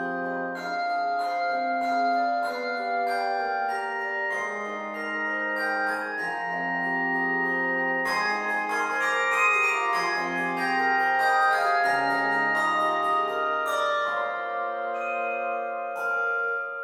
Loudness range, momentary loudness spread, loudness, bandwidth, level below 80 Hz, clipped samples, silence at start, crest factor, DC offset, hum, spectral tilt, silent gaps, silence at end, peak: 5 LU; 8 LU; -25 LUFS; 16.5 kHz; -76 dBFS; under 0.1%; 0 s; 16 dB; under 0.1%; none; -3.5 dB/octave; none; 0 s; -10 dBFS